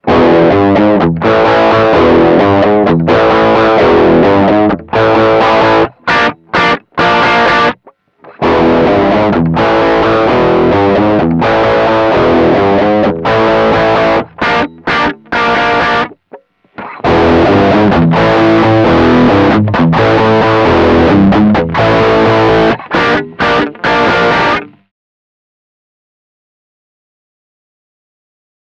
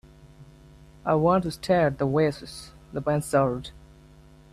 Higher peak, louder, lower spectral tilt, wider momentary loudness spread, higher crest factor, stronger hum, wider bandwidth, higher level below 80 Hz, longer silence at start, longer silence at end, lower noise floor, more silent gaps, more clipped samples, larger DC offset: first, 0 dBFS vs -10 dBFS; first, -9 LUFS vs -25 LUFS; about the same, -7 dB/octave vs -6.5 dB/octave; second, 5 LU vs 16 LU; second, 8 dB vs 18 dB; neither; second, 8 kHz vs 15 kHz; first, -32 dBFS vs -50 dBFS; second, 0.05 s vs 0.4 s; first, 3.95 s vs 0.75 s; second, -44 dBFS vs -51 dBFS; neither; neither; neither